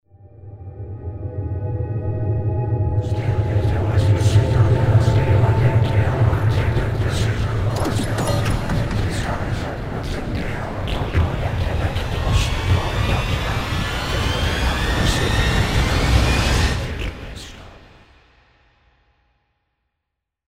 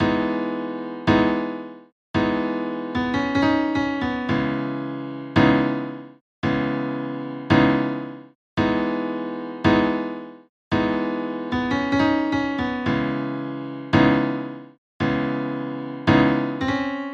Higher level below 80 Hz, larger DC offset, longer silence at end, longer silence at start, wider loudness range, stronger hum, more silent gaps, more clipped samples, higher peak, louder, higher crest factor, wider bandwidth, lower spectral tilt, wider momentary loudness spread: first, -26 dBFS vs -46 dBFS; first, 0.3% vs under 0.1%; first, 2.7 s vs 0 s; first, 0.25 s vs 0 s; first, 7 LU vs 2 LU; neither; second, none vs 1.92-2.14 s, 6.21-6.42 s, 8.35-8.57 s, 10.49-10.71 s, 14.78-15.00 s; neither; about the same, -4 dBFS vs -2 dBFS; first, -20 LUFS vs -23 LUFS; about the same, 16 dB vs 20 dB; first, 15.5 kHz vs 7.4 kHz; second, -6 dB/octave vs -7.5 dB/octave; about the same, 11 LU vs 13 LU